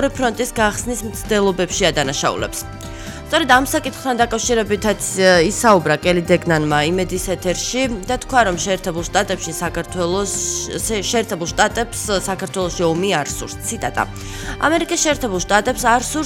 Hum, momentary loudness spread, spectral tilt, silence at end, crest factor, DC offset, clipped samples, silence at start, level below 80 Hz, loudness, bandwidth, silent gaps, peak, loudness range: none; 9 LU; -3.5 dB/octave; 0 s; 18 dB; under 0.1%; under 0.1%; 0 s; -36 dBFS; -18 LUFS; 17.5 kHz; none; 0 dBFS; 4 LU